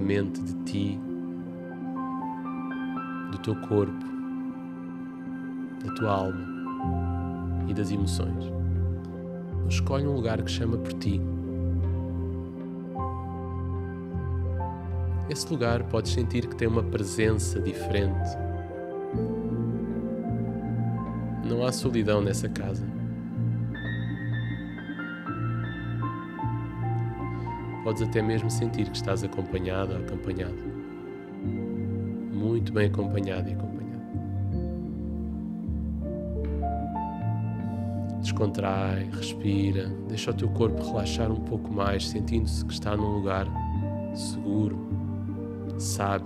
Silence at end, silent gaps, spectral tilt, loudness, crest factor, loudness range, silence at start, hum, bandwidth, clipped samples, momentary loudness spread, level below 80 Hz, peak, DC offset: 0 s; none; -6.5 dB/octave; -30 LUFS; 18 dB; 4 LU; 0 s; none; 13.5 kHz; under 0.1%; 8 LU; -42 dBFS; -10 dBFS; under 0.1%